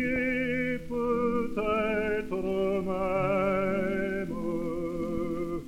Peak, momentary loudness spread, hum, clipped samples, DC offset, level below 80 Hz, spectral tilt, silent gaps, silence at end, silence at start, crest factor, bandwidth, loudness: -14 dBFS; 5 LU; none; under 0.1%; under 0.1%; -48 dBFS; -7.5 dB/octave; none; 0 s; 0 s; 14 dB; 16.5 kHz; -29 LUFS